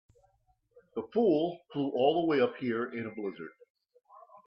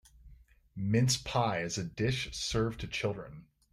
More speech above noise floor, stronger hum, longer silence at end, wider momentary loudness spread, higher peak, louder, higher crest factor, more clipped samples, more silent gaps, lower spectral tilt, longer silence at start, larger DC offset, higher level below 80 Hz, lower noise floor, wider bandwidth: first, 42 dB vs 25 dB; neither; about the same, 0.25 s vs 0.3 s; first, 14 LU vs 11 LU; first, -12 dBFS vs -16 dBFS; about the same, -31 LUFS vs -32 LUFS; about the same, 20 dB vs 18 dB; neither; first, 3.70-3.75 s vs none; first, -8.5 dB/octave vs -4.5 dB/octave; first, 0.95 s vs 0.25 s; neither; second, -76 dBFS vs -52 dBFS; first, -72 dBFS vs -58 dBFS; second, 5.8 kHz vs 15 kHz